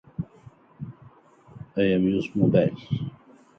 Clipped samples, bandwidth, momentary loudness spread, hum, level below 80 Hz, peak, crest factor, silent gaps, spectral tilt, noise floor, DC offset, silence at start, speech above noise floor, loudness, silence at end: under 0.1%; 6.4 kHz; 20 LU; none; -54 dBFS; -6 dBFS; 20 dB; none; -9 dB/octave; -53 dBFS; under 0.1%; 0.2 s; 30 dB; -24 LUFS; 0.45 s